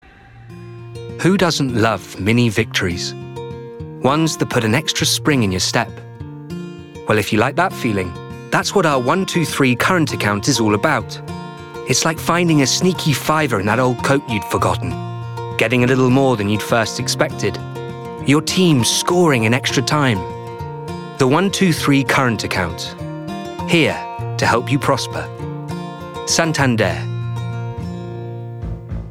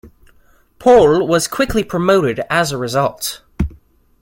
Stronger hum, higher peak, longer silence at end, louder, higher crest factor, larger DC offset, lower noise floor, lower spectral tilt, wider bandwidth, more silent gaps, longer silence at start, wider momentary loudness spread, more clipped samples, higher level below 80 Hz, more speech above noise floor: neither; about the same, 0 dBFS vs 0 dBFS; second, 0 s vs 0.5 s; about the same, -17 LUFS vs -15 LUFS; about the same, 16 dB vs 16 dB; neither; second, -41 dBFS vs -51 dBFS; about the same, -4.5 dB/octave vs -5 dB/octave; about the same, 17.5 kHz vs 17 kHz; neither; first, 0.35 s vs 0.05 s; about the same, 15 LU vs 14 LU; neither; second, -46 dBFS vs -36 dBFS; second, 24 dB vs 37 dB